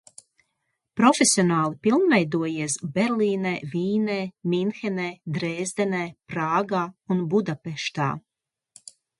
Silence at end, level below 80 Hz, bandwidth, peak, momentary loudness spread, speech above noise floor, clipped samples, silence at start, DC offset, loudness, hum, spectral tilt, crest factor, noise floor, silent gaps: 1 s; -68 dBFS; 11.5 kHz; -4 dBFS; 11 LU; 59 dB; under 0.1%; 0.95 s; under 0.1%; -24 LUFS; none; -4.5 dB/octave; 20 dB; -82 dBFS; none